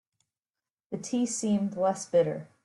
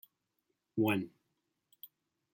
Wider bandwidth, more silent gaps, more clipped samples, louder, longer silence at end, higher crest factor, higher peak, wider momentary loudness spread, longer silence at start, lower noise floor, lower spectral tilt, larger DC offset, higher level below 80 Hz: second, 11.5 kHz vs 16.5 kHz; neither; neither; first, -28 LUFS vs -35 LUFS; second, 0.2 s vs 0.5 s; second, 16 dB vs 22 dB; first, -14 dBFS vs -18 dBFS; second, 9 LU vs 22 LU; first, 0.9 s vs 0.75 s; first, under -90 dBFS vs -84 dBFS; second, -5.5 dB/octave vs -7 dB/octave; neither; first, -72 dBFS vs -78 dBFS